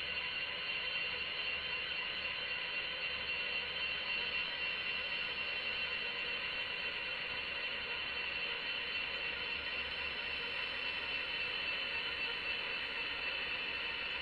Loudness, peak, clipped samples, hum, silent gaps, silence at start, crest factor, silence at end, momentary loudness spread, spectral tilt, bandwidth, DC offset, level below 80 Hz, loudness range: -37 LUFS; -26 dBFS; under 0.1%; none; none; 0 s; 14 dB; 0 s; 2 LU; -3 dB/octave; 11 kHz; under 0.1%; -64 dBFS; 1 LU